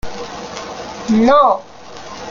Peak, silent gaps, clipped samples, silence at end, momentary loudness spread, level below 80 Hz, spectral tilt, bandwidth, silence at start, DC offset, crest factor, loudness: 0 dBFS; none; under 0.1%; 0 s; 22 LU; -42 dBFS; -5.5 dB/octave; 7.4 kHz; 0.05 s; under 0.1%; 16 dB; -13 LUFS